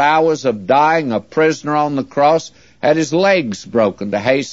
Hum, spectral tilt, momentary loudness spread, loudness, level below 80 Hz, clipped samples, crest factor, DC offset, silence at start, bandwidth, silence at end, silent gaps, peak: none; -5 dB/octave; 6 LU; -15 LUFS; -58 dBFS; under 0.1%; 14 dB; 0.2%; 0 s; 8 kHz; 0 s; none; 0 dBFS